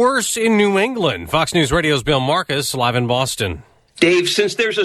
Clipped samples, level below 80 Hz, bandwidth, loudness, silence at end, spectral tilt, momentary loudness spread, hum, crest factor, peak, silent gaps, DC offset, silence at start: under 0.1%; -42 dBFS; 14 kHz; -17 LUFS; 0 s; -4 dB/octave; 6 LU; none; 16 dB; 0 dBFS; none; under 0.1%; 0 s